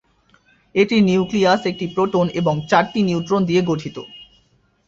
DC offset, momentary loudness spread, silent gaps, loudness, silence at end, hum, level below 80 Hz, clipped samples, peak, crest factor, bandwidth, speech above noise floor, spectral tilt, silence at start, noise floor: under 0.1%; 9 LU; none; -18 LUFS; 0.65 s; none; -54 dBFS; under 0.1%; -2 dBFS; 18 dB; 7.6 kHz; 42 dB; -6.5 dB/octave; 0.75 s; -60 dBFS